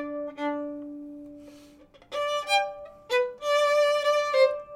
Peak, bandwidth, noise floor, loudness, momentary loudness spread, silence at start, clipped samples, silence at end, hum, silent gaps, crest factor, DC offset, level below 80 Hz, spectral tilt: -10 dBFS; 16 kHz; -53 dBFS; -26 LUFS; 19 LU; 0 s; under 0.1%; 0 s; none; none; 18 dB; under 0.1%; -66 dBFS; -1.5 dB/octave